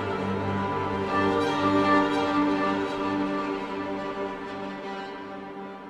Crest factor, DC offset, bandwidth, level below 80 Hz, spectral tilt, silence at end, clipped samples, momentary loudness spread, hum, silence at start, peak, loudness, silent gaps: 18 dB; under 0.1%; 10.5 kHz; -56 dBFS; -6.5 dB/octave; 0 s; under 0.1%; 13 LU; none; 0 s; -10 dBFS; -27 LUFS; none